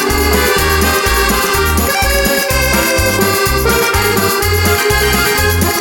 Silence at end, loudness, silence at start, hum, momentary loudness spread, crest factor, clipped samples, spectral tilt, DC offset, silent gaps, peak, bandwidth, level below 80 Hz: 0 s; -11 LUFS; 0 s; none; 1 LU; 12 dB; under 0.1%; -3.5 dB/octave; under 0.1%; none; 0 dBFS; 19.5 kHz; -22 dBFS